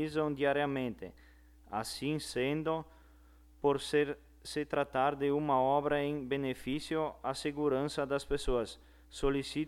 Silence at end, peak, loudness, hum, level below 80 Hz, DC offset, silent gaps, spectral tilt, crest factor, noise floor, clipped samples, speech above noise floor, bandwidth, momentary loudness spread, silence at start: 0 s; -18 dBFS; -34 LUFS; none; -52 dBFS; under 0.1%; none; -5.5 dB/octave; 16 dB; -60 dBFS; under 0.1%; 26 dB; 15 kHz; 10 LU; 0 s